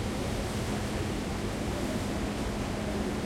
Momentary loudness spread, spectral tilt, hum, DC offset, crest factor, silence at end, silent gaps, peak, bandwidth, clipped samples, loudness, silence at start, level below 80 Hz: 1 LU; -5.5 dB/octave; none; under 0.1%; 12 dB; 0 s; none; -20 dBFS; 16.5 kHz; under 0.1%; -33 LUFS; 0 s; -40 dBFS